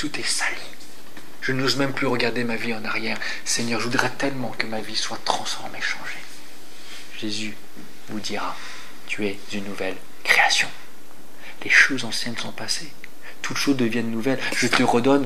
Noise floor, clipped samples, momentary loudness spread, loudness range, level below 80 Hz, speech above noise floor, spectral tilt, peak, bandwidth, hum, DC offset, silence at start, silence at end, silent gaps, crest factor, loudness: -48 dBFS; under 0.1%; 23 LU; 10 LU; -68 dBFS; 24 dB; -3 dB/octave; 0 dBFS; 15.5 kHz; none; 5%; 0 s; 0 s; none; 24 dB; -23 LUFS